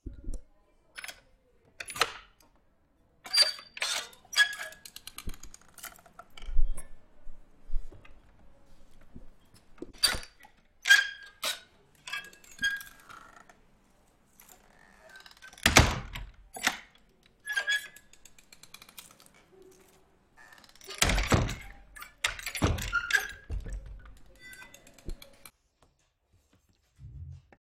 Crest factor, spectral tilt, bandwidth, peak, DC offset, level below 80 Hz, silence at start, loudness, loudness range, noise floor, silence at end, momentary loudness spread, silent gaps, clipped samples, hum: 30 dB; -2.5 dB/octave; 16 kHz; -4 dBFS; under 0.1%; -40 dBFS; 0.05 s; -28 LUFS; 15 LU; -70 dBFS; 0.3 s; 27 LU; none; under 0.1%; none